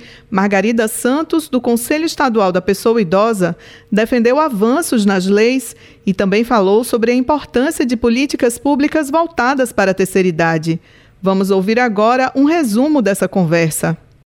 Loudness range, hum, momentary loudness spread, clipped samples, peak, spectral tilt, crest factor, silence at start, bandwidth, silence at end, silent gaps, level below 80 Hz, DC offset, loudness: 1 LU; none; 5 LU; under 0.1%; -2 dBFS; -5.5 dB/octave; 12 dB; 0 s; 17 kHz; 0.3 s; none; -46 dBFS; under 0.1%; -14 LUFS